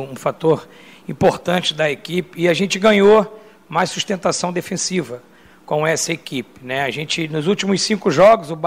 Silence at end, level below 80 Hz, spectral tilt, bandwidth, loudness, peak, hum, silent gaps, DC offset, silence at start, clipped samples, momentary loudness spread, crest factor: 0 s; -54 dBFS; -4 dB/octave; 16 kHz; -18 LUFS; -4 dBFS; none; none; 0.1%; 0 s; under 0.1%; 12 LU; 14 dB